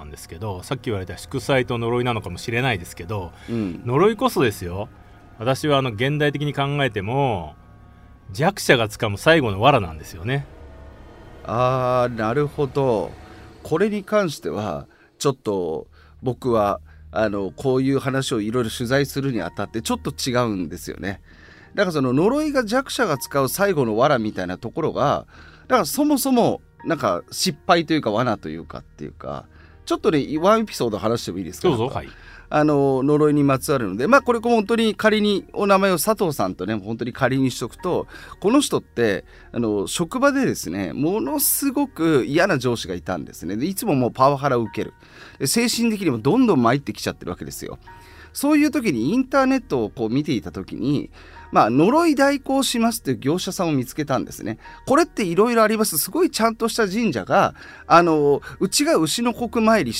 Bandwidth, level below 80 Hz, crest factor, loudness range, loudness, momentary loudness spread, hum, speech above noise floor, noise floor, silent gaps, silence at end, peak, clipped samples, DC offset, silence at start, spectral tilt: 16 kHz; -48 dBFS; 18 dB; 5 LU; -21 LUFS; 13 LU; none; 26 dB; -46 dBFS; none; 0 s; -2 dBFS; under 0.1%; under 0.1%; 0 s; -5 dB/octave